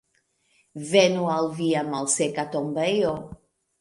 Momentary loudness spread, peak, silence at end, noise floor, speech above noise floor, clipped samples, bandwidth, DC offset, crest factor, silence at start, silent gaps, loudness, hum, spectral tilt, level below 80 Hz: 16 LU; -2 dBFS; 0.45 s; -69 dBFS; 46 dB; under 0.1%; 11.5 kHz; under 0.1%; 22 dB; 0.75 s; none; -23 LUFS; none; -4 dB/octave; -60 dBFS